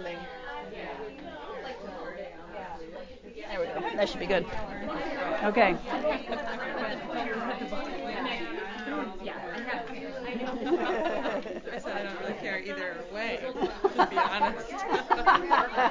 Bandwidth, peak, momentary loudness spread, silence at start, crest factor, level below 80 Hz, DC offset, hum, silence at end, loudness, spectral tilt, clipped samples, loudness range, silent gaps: 7.6 kHz; -8 dBFS; 15 LU; 0 s; 24 dB; -54 dBFS; under 0.1%; none; 0 s; -31 LUFS; -5 dB/octave; under 0.1%; 7 LU; none